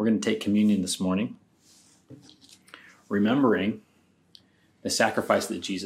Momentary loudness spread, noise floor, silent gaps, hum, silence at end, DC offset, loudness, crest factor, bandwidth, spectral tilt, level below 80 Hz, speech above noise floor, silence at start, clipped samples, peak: 9 LU; -64 dBFS; none; none; 0 s; under 0.1%; -25 LUFS; 20 dB; 15.5 kHz; -4.5 dB/octave; -70 dBFS; 39 dB; 0 s; under 0.1%; -6 dBFS